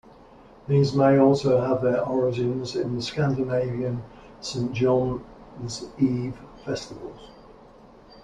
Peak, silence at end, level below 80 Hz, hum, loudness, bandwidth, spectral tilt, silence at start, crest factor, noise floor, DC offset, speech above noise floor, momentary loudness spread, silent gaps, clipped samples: -6 dBFS; 0.05 s; -52 dBFS; none; -24 LUFS; 10 kHz; -7 dB/octave; 0.65 s; 18 dB; -50 dBFS; under 0.1%; 26 dB; 19 LU; none; under 0.1%